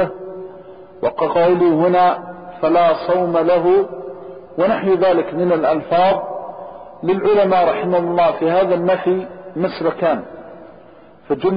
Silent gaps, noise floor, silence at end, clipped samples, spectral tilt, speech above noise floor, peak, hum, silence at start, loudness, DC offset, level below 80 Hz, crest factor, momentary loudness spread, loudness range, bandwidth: none; -44 dBFS; 0 s; under 0.1%; -5 dB/octave; 29 dB; -6 dBFS; none; 0 s; -16 LUFS; 0.3%; -54 dBFS; 10 dB; 18 LU; 3 LU; 5.2 kHz